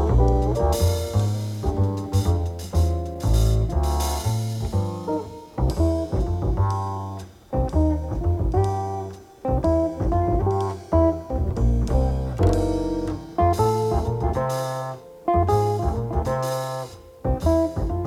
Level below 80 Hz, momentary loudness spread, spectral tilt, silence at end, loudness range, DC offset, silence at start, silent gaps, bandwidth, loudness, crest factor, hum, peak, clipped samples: -28 dBFS; 8 LU; -7.5 dB/octave; 0 s; 2 LU; under 0.1%; 0 s; none; 16 kHz; -24 LUFS; 16 dB; none; -6 dBFS; under 0.1%